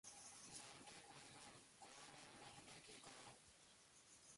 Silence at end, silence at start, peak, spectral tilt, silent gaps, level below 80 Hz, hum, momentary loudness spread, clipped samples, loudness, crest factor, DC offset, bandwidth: 0 s; 0.05 s; -44 dBFS; -1.5 dB/octave; none; -86 dBFS; none; 9 LU; under 0.1%; -61 LUFS; 20 dB; under 0.1%; 11.5 kHz